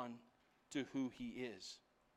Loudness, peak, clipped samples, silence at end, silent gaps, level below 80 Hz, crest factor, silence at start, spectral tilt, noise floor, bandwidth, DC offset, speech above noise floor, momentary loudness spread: -47 LUFS; -30 dBFS; under 0.1%; 0.35 s; none; -78 dBFS; 18 dB; 0 s; -4.5 dB/octave; -74 dBFS; 12.5 kHz; under 0.1%; 27 dB; 13 LU